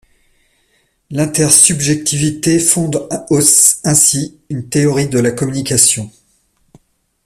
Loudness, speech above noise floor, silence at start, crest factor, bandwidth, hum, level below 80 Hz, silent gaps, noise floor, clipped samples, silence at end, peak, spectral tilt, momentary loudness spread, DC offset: -11 LUFS; 46 dB; 1.1 s; 14 dB; over 20 kHz; none; -48 dBFS; none; -59 dBFS; 0.1%; 1.15 s; 0 dBFS; -3.5 dB/octave; 13 LU; under 0.1%